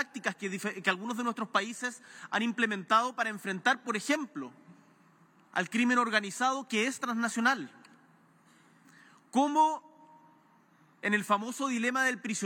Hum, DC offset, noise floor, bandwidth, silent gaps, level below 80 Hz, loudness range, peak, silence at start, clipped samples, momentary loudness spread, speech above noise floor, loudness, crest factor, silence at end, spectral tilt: none; under 0.1%; -63 dBFS; 17 kHz; none; under -90 dBFS; 3 LU; -10 dBFS; 0 s; under 0.1%; 9 LU; 33 dB; -30 LUFS; 22 dB; 0 s; -3 dB/octave